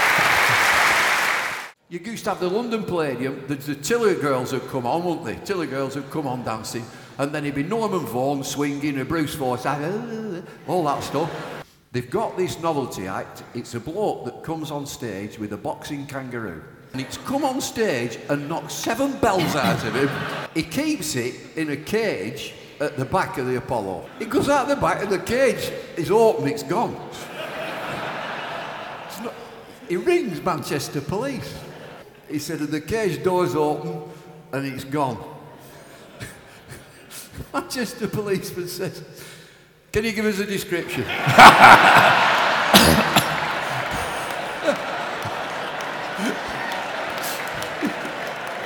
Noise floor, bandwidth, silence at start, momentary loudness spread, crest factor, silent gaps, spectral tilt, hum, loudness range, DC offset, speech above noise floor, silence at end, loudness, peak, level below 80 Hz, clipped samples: -50 dBFS; 19 kHz; 0 s; 17 LU; 22 dB; none; -4 dB/octave; none; 16 LU; under 0.1%; 28 dB; 0 s; -21 LUFS; 0 dBFS; -50 dBFS; under 0.1%